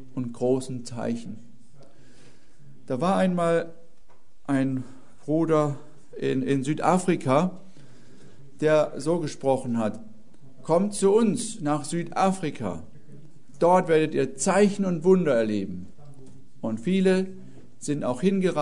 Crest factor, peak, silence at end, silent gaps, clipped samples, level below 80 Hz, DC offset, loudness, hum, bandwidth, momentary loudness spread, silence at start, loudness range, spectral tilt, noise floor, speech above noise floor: 18 dB; -6 dBFS; 0 s; none; under 0.1%; -62 dBFS; 1%; -25 LUFS; none; 11 kHz; 14 LU; 0 s; 5 LU; -6 dB/octave; -60 dBFS; 37 dB